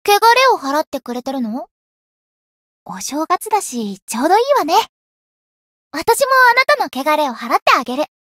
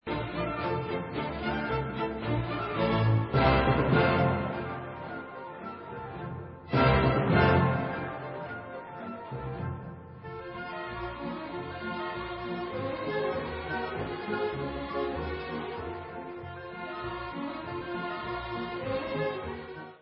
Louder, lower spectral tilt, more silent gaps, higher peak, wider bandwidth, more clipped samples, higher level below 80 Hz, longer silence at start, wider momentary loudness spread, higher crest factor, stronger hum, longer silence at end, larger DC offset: first, -15 LUFS vs -31 LUFS; second, -2 dB/octave vs -10.5 dB/octave; first, 0.87-0.92 s, 1.71-2.86 s, 4.02-4.07 s, 4.89-5.91 s, 7.62-7.66 s vs none; first, 0 dBFS vs -10 dBFS; first, 16.5 kHz vs 5.6 kHz; neither; second, -62 dBFS vs -44 dBFS; about the same, 0.05 s vs 0.05 s; about the same, 14 LU vs 16 LU; second, 16 dB vs 22 dB; neither; first, 0.2 s vs 0.05 s; neither